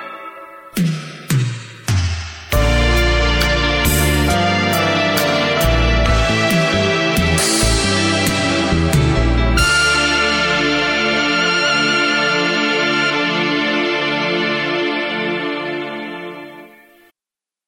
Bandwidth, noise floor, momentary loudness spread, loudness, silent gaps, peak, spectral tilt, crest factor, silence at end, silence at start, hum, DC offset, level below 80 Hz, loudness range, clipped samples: 17 kHz; -89 dBFS; 10 LU; -15 LUFS; none; -2 dBFS; -4 dB/octave; 14 dB; 1 s; 0 s; none; under 0.1%; -24 dBFS; 5 LU; under 0.1%